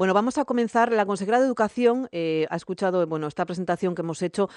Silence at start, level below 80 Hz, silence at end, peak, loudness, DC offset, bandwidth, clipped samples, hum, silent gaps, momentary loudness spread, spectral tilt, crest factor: 0 s; -66 dBFS; 0 s; -6 dBFS; -24 LUFS; under 0.1%; 10 kHz; under 0.1%; none; none; 7 LU; -6 dB/octave; 18 dB